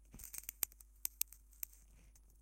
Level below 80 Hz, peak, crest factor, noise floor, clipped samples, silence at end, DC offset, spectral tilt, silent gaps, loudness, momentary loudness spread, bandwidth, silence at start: -64 dBFS; -12 dBFS; 38 dB; -63 dBFS; under 0.1%; 0 s; under 0.1%; 0 dB/octave; none; -44 LUFS; 8 LU; 17 kHz; 0 s